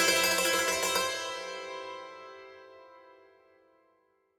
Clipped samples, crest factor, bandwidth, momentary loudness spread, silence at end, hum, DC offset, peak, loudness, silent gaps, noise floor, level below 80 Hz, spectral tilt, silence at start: under 0.1%; 20 dB; 19 kHz; 23 LU; 1.4 s; none; under 0.1%; -12 dBFS; -28 LUFS; none; -71 dBFS; -68 dBFS; -0.5 dB/octave; 0 s